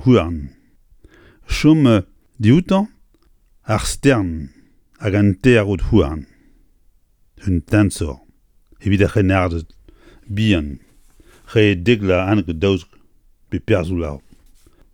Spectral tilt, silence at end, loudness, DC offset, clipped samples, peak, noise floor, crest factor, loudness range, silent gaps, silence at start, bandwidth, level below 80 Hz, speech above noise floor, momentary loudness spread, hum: -6.5 dB/octave; 0.75 s; -17 LUFS; under 0.1%; under 0.1%; 0 dBFS; -55 dBFS; 18 dB; 3 LU; none; 0 s; 17 kHz; -34 dBFS; 39 dB; 15 LU; none